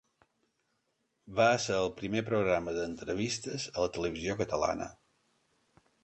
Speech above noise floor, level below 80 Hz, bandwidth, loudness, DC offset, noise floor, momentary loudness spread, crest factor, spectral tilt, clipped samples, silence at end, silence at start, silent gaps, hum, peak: 47 dB; -58 dBFS; 8.8 kHz; -32 LUFS; under 0.1%; -79 dBFS; 9 LU; 20 dB; -4.5 dB/octave; under 0.1%; 1.1 s; 1.25 s; none; none; -12 dBFS